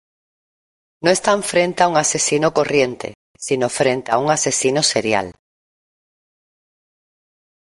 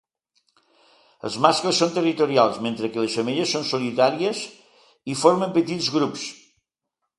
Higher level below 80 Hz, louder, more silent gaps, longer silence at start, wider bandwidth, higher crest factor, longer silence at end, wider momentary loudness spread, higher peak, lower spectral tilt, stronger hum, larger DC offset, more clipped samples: first, -58 dBFS vs -68 dBFS; first, -17 LUFS vs -22 LUFS; first, 3.15-3.34 s vs none; second, 1 s vs 1.25 s; about the same, 11.5 kHz vs 11.5 kHz; about the same, 18 dB vs 22 dB; first, 2.3 s vs 0.85 s; second, 7 LU vs 13 LU; about the same, -2 dBFS vs 0 dBFS; about the same, -3 dB/octave vs -4 dB/octave; neither; neither; neither